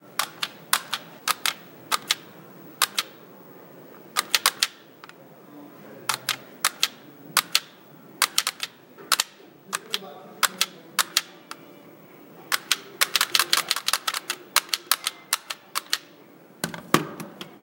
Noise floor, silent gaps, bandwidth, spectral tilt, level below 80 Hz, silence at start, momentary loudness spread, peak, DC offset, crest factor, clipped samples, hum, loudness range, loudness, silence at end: -50 dBFS; none; 17 kHz; 0 dB/octave; -74 dBFS; 0.1 s; 22 LU; 0 dBFS; under 0.1%; 28 dB; under 0.1%; none; 4 LU; -25 LUFS; 0.1 s